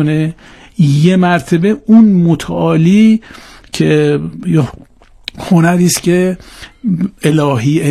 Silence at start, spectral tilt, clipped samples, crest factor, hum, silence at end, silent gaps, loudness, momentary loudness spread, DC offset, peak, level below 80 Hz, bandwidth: 0 s; -6.5 dB/octave; 0.5%; 12 dB; none; 0 s; none; -11 LUFS; 13 LU; under 0.1%; 0 dBFS; -42 dBFS; 14 kHz